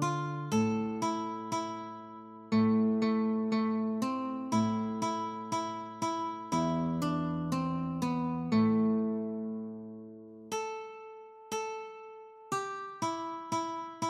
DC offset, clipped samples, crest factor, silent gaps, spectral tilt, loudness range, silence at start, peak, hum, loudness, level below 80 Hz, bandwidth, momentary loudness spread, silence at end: under 0.1%; under 0.1%; 16 dB; none; -6 dB/octave; 8 LU; 0 s; -18 dBFS; none; -33 LUFS; -66 dBFS; 13.5 kHz; 17 LU; 0 s